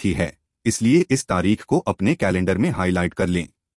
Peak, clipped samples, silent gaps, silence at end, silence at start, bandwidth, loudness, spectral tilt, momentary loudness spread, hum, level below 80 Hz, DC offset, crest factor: -6 dBFS; under 0.1%; none; 0.3 s; 0 s; 12 kHz; -21 LUFS; -6 dB/octave; 7 LU; none; -46 dBFS; under 0.1%; 16 dB